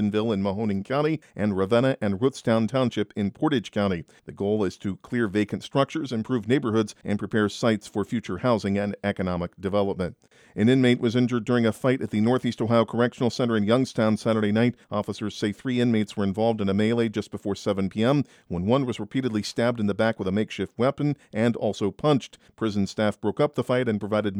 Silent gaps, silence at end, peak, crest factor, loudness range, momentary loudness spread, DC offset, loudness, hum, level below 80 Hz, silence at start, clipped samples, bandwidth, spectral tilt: none; 0 s; -8 dBFS; 18 dB; 3 LU; 7 LU; under 0.1%; -25 LUFS; none; -60 dBFS; 0 s; under 0.1%; 13 kHz; -6.5 dB/octave